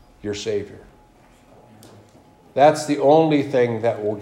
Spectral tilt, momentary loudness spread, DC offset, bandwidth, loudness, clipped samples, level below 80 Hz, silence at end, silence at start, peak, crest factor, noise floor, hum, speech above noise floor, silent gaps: -6 dB/octave; 13 LU; under 0.1%; 15.5 kHz; -19 LUFS; under 0.1%; -58 dBFS; 0 s; 0.25 s; -2 dBFS; 20 dB; -52 dBFS; none; 33 dB; none